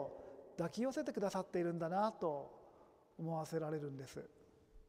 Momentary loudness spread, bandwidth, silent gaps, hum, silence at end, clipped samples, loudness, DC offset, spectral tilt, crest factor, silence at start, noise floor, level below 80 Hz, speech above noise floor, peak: 17 LU; 15.5 kHz; none; none; 0.05 s; under 0.1%; -42 LUFS; under 0.1%; -6.5 dB/octave; 18 dB; 0 s; -66 dBFS; -74 dBFS; 25 dB; -24 dBFS